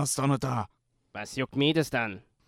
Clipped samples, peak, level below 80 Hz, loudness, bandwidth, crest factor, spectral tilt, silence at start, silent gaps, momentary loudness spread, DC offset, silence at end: under 0.1%; -12 dBFS; -60 dBFS; -29 LUFS; 15.5 kHz; 18 dB; -4.5 dB/octave; 0 s; none; 15 LU; under 0.1%; 0.25 s